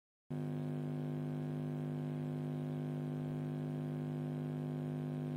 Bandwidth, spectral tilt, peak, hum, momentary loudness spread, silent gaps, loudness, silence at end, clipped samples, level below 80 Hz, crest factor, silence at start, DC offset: 9.8 kHz; -9.5 dB/octave; -30 dBFS; 50 Hz at -40 dBFS; 0 LU; none; -41 LUFS; 0 s; under 0.1%; -76 dBFS; 10 dB; 0.3 s; under 0.1%